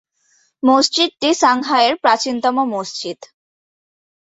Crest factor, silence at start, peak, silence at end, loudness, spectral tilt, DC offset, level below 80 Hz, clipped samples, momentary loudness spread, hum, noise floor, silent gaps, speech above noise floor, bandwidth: 16 dB; 0.65 s; -2 dBFS; 1 s; -16 LUFS; -2 dB/octave; under 0.1%; -64 dBFS; under 0.1%; 12 LU; none; -60 dBFS; none; 44 dB; 8.2 kHz